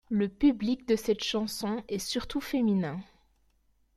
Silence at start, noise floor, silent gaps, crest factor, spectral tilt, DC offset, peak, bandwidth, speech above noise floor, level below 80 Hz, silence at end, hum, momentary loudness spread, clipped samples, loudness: 0.1 s; -69 dBFS; none; 16 dB; -5 dB/octave; under 0.1%; -14 dBFS; 15.5 kHz; 40 dB; -54 dBFS; 0.95 s; none; 8 LU; under 0.1%; -30 LUFS